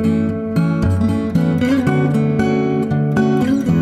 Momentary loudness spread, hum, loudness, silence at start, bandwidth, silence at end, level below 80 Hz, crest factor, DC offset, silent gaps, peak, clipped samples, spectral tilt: 2 LU; none; -16 LUFS; 0 s; 13 kHz; 0 s; -38 dBFS; 12 dB; under 0.1%; none; -4 dBFS; under 0.1%; -8.5 dB/octave